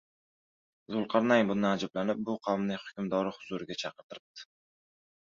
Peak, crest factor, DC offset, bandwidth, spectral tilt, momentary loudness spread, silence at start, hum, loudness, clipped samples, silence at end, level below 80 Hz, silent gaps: -10 dBFS; 22 dB; under 0.1%; 7.4 kHz; -6 dB/octave; 21 LU; 0.9 s; none; -31 LUFS; under 0.1%; 0.85 s; -72 dBFS; 4.03-4.10 s, 4.20-4.35 s